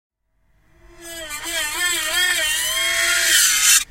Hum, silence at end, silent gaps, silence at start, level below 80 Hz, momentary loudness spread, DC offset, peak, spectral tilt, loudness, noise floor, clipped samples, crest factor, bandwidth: none; 0.05 s; none; 1 s; -50 dBFS; 16 LU; under 0.1%; 0 dBFS; 2.5 dB/octave; -16 LUFS; -62 dBFS; under 0.1%; 20 dB; 16 kHz